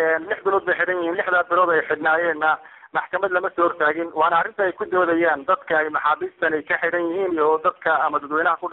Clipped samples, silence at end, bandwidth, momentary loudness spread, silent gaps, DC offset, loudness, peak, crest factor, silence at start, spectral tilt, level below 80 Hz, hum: under 0.1%; 0 s; 4.1 kHz; 4 LU; none; under 0.1%; -21 LUFS; -6 dBFS; 14 dB; 0 s; -7 dB/octave; -66 dBFS; none